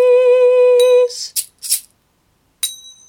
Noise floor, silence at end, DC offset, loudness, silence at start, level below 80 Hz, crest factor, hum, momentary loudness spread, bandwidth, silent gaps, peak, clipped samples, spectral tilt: -60 dBFS; 0.35 s; under 0.1%; -14 LUFS; 0 s; -68 dBFS; 14 dB; none; 12 LU; 18 kHz; none; 0 dBFS; under 0.1%; 2 dB/octave